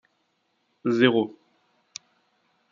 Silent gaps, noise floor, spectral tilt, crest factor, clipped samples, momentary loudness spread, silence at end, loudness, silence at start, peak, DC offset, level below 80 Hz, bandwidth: none; -72 dBFS; -5.5 dB/octave; 24 dB; under 0.1%; 23 LU; 1.45 s; -23 LUFS; 0.85 s; -4 dBFS; under 0.1%; -78 dBFS; 7.4 kHz